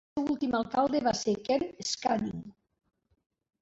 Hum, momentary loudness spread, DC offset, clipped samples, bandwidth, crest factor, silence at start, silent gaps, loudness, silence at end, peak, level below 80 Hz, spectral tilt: none; 5 LU; under 0.1%; under 0.1%; 8 kHz; 18 dB; 0.15 s; none; -30 LUFS; 1.1 s; -14 dBFS; -62 dBFS; -4.5 dB/octave